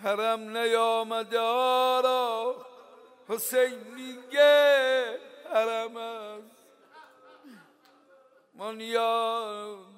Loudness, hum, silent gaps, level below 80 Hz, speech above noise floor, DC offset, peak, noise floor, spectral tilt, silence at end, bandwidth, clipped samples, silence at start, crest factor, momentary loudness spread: -26 LUFS; none; none; under -90 dBFS; 34 dB; under 0.1%; -10 dBFS; -60 dBFS; -1.5 dB/octave; 0.15 s; 16 kHz; under 0.1%; 0 s; 18 dB; 19 LU